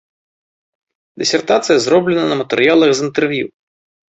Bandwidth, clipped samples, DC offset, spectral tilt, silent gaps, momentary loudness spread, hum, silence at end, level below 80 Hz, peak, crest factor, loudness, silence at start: 8.2 kHz; under 0.1%; under 0.1%; -4 dB/octave; none; 8 LU; none; 0.7 s; -58 dBFS; -2 dBFS; 14 dB; -14 LUFS; 1.15 s